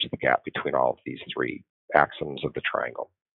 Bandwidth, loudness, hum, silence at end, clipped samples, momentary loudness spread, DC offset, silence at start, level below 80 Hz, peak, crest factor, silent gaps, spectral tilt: 5 kHz; -27 LUFS; none; 0.35 s; under 0.1%; 12 LU; under 0.1%; 0 s; -60 dBFS; -2 dBFS; 26 dB; 1.69-1.88 s; -2 dB/octave